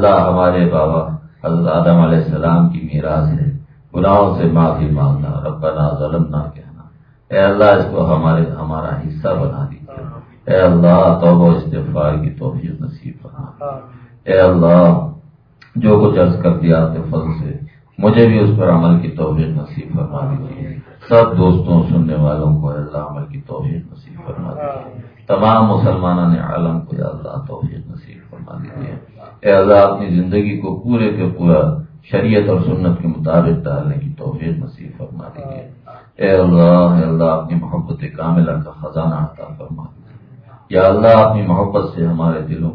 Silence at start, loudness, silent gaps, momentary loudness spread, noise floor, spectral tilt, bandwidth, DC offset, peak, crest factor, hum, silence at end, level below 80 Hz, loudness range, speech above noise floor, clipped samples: 0 s; -14 LUFS; none; 20 LU; -45 dBFS; -11.5 dB/octave; 4.9 kHz; under 0.1%; 0 dBFS; 14 dB; none; 0 s; -36 dBFS; 5 LU; 32 dB; under 0.1%